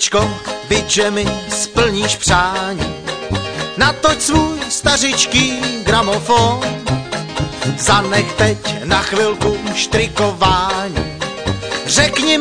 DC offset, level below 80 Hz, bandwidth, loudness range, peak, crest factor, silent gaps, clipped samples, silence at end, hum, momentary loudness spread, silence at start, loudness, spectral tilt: 0.5%; -32 dBFS; 10.5 kHz; 2 LU; 0 dBFS; 16 dB; none; under 0.1%; 0 s; none; 9 LU; 0 s; -15 LUFS; -3 dB/octave